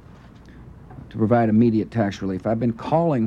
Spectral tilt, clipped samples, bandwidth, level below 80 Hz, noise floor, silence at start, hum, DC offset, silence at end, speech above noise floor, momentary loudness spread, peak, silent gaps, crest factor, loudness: -9 dB/octave; under 0.1%; 7.4 kHz; -50 dBFS; -45 dBFS; 0.5 s; none; under 0.1%; 0 s; 25 dB; 17 LU; -8 dBFS; none; 14 dB; -21 LUFS